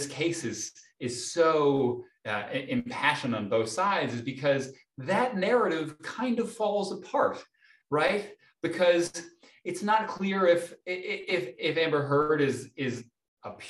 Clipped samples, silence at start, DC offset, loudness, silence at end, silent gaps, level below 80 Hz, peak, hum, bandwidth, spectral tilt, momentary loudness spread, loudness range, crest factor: under 0.1%; 0 s; under 0.1%; -28 LUFS; 0 s; 13.28-13.37 s; -70 dBFS; -10 dBFS; none; 12.5 kHz; -4.5 dB/octave; 12 LU; 2 LU; 18 dB